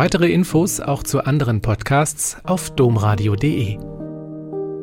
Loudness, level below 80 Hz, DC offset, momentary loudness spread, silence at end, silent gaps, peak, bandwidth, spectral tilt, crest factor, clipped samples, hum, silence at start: -19 LUFS; -38 dBFS; under 0.1%; 14 LU; 0 s; none; -4 dBFS; 17 kHz; -5.5 dB/octave; 14 dB; under 0.1%; none; 0 s